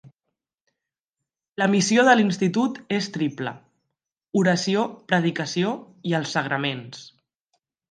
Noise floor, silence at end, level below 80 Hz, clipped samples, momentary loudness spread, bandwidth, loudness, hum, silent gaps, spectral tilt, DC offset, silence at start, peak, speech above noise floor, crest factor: -86 dBFS; 0.85 s; -72 dBFS; under 0.1%; 15 LU; 10 kHz; -23 LUFS; none; 0.54-0.67 s, 1.04-1.13 s; -5 dB/octave; under 0.1%; 0.05 s; -4 dBFS; 64 dB; 20 dB